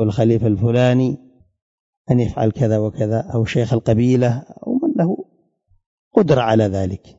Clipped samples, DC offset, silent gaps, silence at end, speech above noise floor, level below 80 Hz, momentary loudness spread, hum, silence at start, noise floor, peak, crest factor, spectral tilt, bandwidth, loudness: under 0.1%; under 0.1%; 1.62-2.05 s, 5.86-6.11 s; 0.2 s; 44 dB; -46 dBFS; 7 LU; none; 0 s; -60 dBFS; 0 dBFS; 18 dB; -8 dB/octave; 7.8 kHz; -18 LUFS